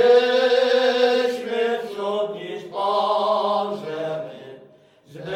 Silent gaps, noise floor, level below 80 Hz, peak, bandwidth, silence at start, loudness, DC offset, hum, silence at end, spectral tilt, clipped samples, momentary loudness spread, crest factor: none; -51 dBFS; -72 dBFS; -6 dBFS; 10.5 kHz; 0 s; -21 LUFS; under 0.1%; none; 0 s; -4 dB/octave; under 0.1%; 14 LU; 16 dB